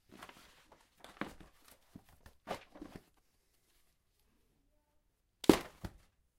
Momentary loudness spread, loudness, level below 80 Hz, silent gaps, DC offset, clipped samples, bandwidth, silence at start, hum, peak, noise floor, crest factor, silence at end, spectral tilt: 29 LU; -36 LUFS; -62 dBFS; none; under 0.1%; under 0.1%; 16 kHz; 0.2 s; none; -6 dBFS; -77 dBFS; 36 dB; 0.5 s; -5 dB/octave